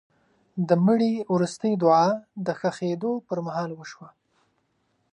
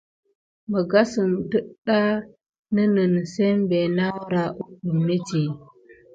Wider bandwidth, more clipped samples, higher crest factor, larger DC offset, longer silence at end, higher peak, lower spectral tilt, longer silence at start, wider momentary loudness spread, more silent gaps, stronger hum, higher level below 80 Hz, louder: first, 10.5 kHz vs 8 kHz; neither; about the same, 18 dB vs 18 dB; neither; first, 1.05 s vs 0.2 s; about the same, -8 dBFS vs -6 dBFS; about the same, -7 dB/octave vs -7 dB/octave; second, 0.55 s vs 0.7 s; first, 13 LU vs 9 LU; second, none vs 1.78-1.82 s, 2.49-2.53 s, 2.59-2.63 s; neither; second, -74 dBFS vs -62 dBFS; about the same, -24 LUFS vs -23 LUFS